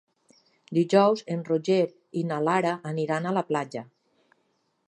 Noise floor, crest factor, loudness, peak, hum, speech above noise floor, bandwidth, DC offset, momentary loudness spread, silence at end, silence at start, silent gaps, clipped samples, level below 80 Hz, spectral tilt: -72 dBFS; 20 dB; -26 LUFS; -6 dBFS; none; 47 dB; 10.5 kHz; under 0.1%; 9 LU; 1.05 s; 0.7 s; none; under 0.1%; -78 dBFS; -6.5 dB/octave